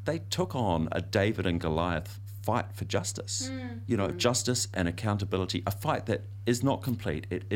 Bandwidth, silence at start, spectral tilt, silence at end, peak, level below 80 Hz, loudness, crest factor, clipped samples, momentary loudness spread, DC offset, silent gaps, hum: 16.5 kHz; 0 s; -5 dB/octave; 0 s; -10 dBFS; -50 dBFS; -30 LUFS; 20 dB; under 0.1%; 6 LU; under 0.1%; none; none